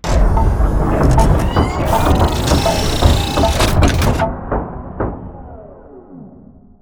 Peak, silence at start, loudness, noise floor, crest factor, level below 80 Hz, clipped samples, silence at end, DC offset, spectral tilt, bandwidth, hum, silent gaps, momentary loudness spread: 0 dBFS; 0.05 s; -15 LUFS; -41 dBFS; 14 dB; -18 dBFS; under 0.1%; 0.55 s; under 0.1%; -5.5 dB/octave; over 20 kHz; none; none; 10 LU